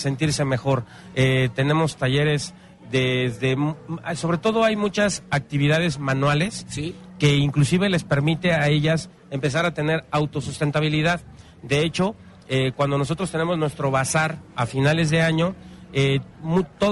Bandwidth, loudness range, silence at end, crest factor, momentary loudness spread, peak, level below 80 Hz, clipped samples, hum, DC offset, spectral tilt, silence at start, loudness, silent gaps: 11.5 kHz; 2 LU; 0 s; 16 dB; 7 LU; -6 dBFS; -48 dBFS; under 0.1%; none; under 0.1%; -5.5 dB/octave; 0 s; -22 LUFS; none